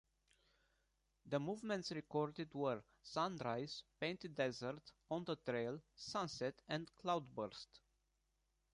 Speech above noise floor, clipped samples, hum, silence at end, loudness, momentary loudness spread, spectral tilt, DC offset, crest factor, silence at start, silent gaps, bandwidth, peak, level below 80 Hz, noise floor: 40 dB; under 0.1%; none; 0.95 s; -45 LUFS; 7 LU; -5.5 dB/octave; under 0.1%; 20 dB; 1.25 s; none; 11 kHz; -26 dBFS; -78 dBFS; -84 dBFS